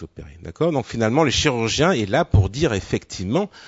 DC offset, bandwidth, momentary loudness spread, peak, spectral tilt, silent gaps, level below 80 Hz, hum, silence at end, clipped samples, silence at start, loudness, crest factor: under 0.1%; 8 kHz; 9 LU; -4 dBFS; -5 dB/octave; none; -36 dBFS; none; 0 s; under 0.1%; 0 s; -20 LUFS; 16 dB